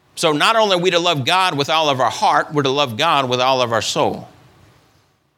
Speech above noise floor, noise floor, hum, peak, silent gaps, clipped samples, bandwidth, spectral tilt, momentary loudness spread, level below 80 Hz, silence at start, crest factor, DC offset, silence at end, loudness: 42 dB; -58 dBFS; none; 0 dBFS; none; under 0.1%; 18.5 kHz; -3.5 dB/octave; 5 LU; -62 dBFS; 0.15 s; 16 dB; under 0.1%; 1.1 s; -16 LUFS